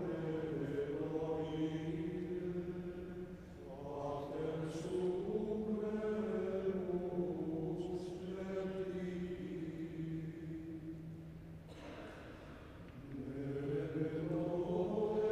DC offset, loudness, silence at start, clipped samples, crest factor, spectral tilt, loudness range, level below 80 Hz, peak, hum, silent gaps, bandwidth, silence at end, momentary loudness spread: under 0.1%; -41 LUFS; 0 s; under 0.1%; 16 dB; -8 dB/octave; 8 LU; -62 dBFS; -26 dBFS; none; none; 12 kHz; 0 s; 13 LU